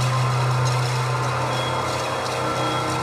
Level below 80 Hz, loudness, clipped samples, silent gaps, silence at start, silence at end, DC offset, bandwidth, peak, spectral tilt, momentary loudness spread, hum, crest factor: -50 dBFS; -22 LUFS; under 0.1%; none; 0 s; 0 s; under 0.1%; 14 kHz; -10 dBFS; -5 dB/octave; 3 LU; none; 12 dB